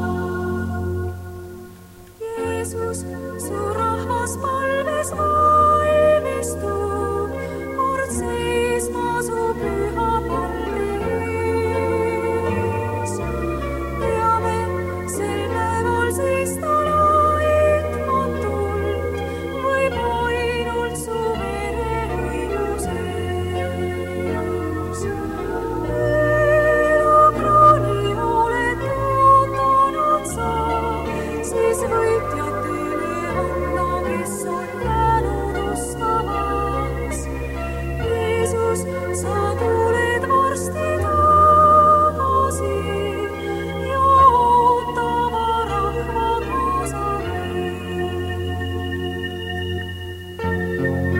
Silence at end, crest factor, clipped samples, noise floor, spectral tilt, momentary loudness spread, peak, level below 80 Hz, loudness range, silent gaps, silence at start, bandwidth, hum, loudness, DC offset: 0 s; 18 dB; under 0.1%; -42 dBFS; -5.5 dB/octave; 11 LU; -2 dBFS; -34 dBFS; 8 LU; none; 0 s; 16.5 kHz; none; -20 LUFS; under 0.1%